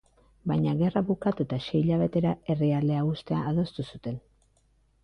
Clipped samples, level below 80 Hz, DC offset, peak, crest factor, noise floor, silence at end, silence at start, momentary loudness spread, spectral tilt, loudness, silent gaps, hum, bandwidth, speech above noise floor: under 0.1%; -56 dBFS; under 0.1%; -12 dBFS; 16 dB; -66 dBFS; 0.85 s; 0.45 s; 11 LU; -9.5 dB/octave; -28 LUFS; none; none; 6 kHz; 39 dB